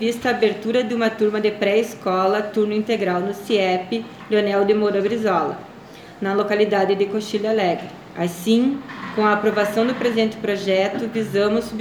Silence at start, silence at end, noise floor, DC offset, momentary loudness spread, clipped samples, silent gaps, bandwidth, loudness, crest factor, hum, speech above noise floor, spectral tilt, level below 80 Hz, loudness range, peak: 0 s; 0 s; -40 dBFS; under 0.1%; 9 LU; under 0.1%; none; 19 kHz; -20 LUFS; 16 dB; none; 20 dB; -5.5 dB/octave; -60 dBFS; 1 LU; -4 dBFS